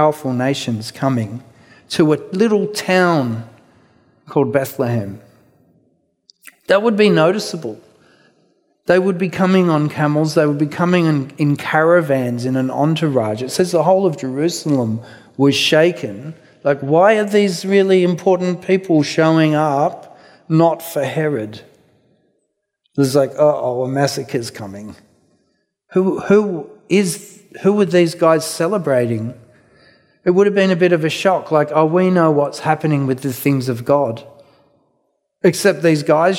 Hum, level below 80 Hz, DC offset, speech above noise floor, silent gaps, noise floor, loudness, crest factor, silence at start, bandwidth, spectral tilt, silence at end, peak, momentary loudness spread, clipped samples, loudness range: none; -64 dBFS; under 0.1%; 55 dB; none; -70 dBFS; -16 LUFS; 16 dB; 0 s; 16.5 kHz; -6 dB/octave; 0 s; 0 dBFS; 11 LU; under 0.1%; 5 LU